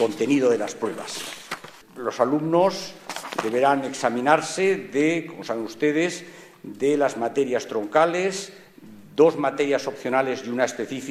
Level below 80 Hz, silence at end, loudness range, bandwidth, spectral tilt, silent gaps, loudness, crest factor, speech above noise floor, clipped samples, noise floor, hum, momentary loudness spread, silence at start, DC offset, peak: -72 dBFS; 0 s; 2 LU; 15 kHz; -4.5 dB/octave; none; -23 LUFS; 20 dB; 23 dB; under 0.1%; -45 dBFS; none; 13 LU; 0 s; under 0.1%; -4 dBFS